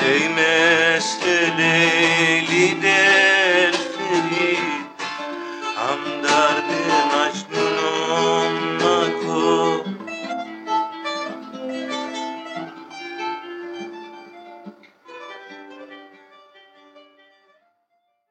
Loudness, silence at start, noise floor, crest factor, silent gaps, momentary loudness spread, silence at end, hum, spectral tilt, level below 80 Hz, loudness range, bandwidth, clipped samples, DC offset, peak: -19 LUFS; 0 s; -69 dBFS; 16 dB; none; 19 LU; 1.3 s; none; -3 dB/octave; -78 dBFS; 18 LU; 11 kHz; under 0.1%; under 0.1%; -4 dBFS